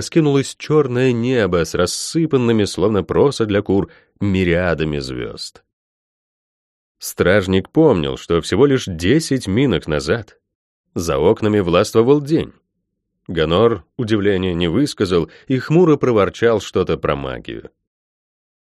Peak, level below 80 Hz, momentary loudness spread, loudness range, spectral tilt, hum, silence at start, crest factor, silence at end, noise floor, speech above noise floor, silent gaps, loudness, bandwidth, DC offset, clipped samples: -2 dBFS; -42 dBFS; 11 LU; 4 LU; -6 dB/octave; none; 0 s; 16 dB; 1.2 s; -74 dBFS; 57 dB; 5.73-6.95 s, 10.55-10.84 s; -17 LUFS; 13 kHz; under 0.1%; under 0.1%